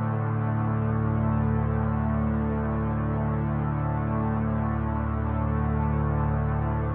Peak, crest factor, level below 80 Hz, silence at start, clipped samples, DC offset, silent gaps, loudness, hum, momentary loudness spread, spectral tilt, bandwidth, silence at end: -14 dBFS; 12 dB; -34 dBFS; 0 s; under 0.1%; under 0.1%; none; -27 LUFS; none; 2 LU; -13 dB/octave; 3.5 kHz; 0 s